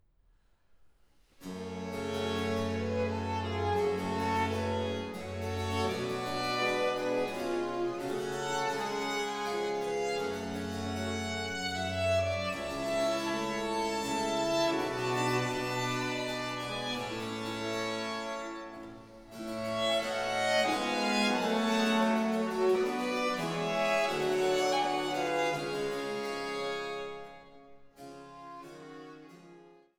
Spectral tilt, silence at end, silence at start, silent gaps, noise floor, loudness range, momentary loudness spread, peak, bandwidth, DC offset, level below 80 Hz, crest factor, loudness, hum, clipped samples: -4.5 dB/octave; 0.25 s; 1.4 s; none; -66 dBFS; 7 LU; 13 LU; -16 dBFS; over 20 kHz; under 0.1%; -62 dBFS; 18 dB; -32 LUFS; none; under 0.1%